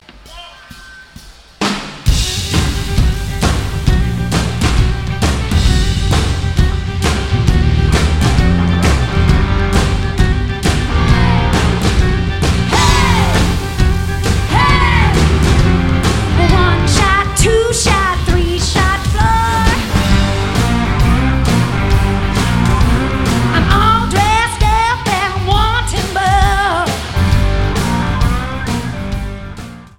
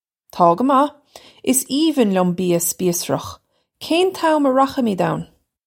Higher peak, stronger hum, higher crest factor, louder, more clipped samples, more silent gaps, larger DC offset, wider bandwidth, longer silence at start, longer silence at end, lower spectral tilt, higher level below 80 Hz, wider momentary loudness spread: about the same, 0 dBFS vs -2 dBFS; neither; second, 12 dB vs 18 dB; first, -13 LUFS vs -18 LUFS; neither; neither; first, 2% vs under 0.1%; about the same, 16.5 kHz vs 17 kHz; second, 0 s vs 0.35 s; second, 0 s vs 0.4 s; about the same, -5 dB/octave vs -4.5 dB/octave; first, -18 dBFS vs -60 dBFS; second, 6 LU vs 10 LU